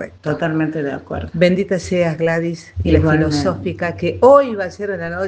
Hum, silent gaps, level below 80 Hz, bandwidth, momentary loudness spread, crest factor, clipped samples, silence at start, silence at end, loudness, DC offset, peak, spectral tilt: none; none; -40 dBFS; 9.2 kHz; 12 LU; 16 dB; under 0.1%; 0 s; 0 s; -17 LUFS; under 0.1%; 0 dBFS; -7 dB/octave